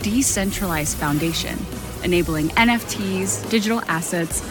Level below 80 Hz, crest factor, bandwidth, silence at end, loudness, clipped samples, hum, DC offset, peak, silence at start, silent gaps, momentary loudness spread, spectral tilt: -36 dBFS; 20 dB; 17.5 kHz; 0 s; -21 LUFS; under 0.1%; none; under 0.1%; -2 dBFS; 0 s; none; 7 LU; -3.5 dB/octave